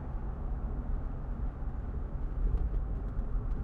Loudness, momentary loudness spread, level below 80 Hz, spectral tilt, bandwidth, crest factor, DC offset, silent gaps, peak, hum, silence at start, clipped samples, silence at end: -38 LUFS; 5 LU; -34 dBFS; -10.5 dB/octave; 2.7 kHz; 14 dB; under 0.1%; none; -20 dBFS; none; 0 s; under 0.1%; 0 s